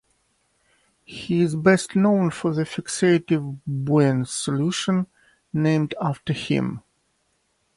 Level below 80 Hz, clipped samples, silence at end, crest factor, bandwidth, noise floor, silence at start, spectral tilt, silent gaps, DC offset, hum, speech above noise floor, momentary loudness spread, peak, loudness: -60 dBFS; under 0.1%; 0.95 s; 18 dB; 11.5 kHz; -69 dBFS; 1.1 s; -6 dB/octave; none; under 0.1%; none; 48 dB; 11 LU; -4 dBFS; -22 LUFS